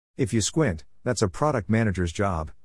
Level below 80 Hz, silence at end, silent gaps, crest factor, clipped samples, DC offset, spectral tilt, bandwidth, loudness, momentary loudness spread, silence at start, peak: -46 dBFS; 0.15 s; none; 16 dB; under 0.1%; 0.3%; -5.5 dB/octave; 12 kHz; -25 LUFS; 4 LU; 0.2 s; -8 dBFS